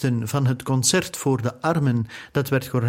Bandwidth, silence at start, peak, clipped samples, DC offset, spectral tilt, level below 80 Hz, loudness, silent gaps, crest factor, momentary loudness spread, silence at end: 16.5 kHz; 0 s; -6 dBFS; under 0.1%; under 0.1%; -5 dB/octave; -54 dBFS; -22 LUFS; none; 16 dB; 6 LU; 0 s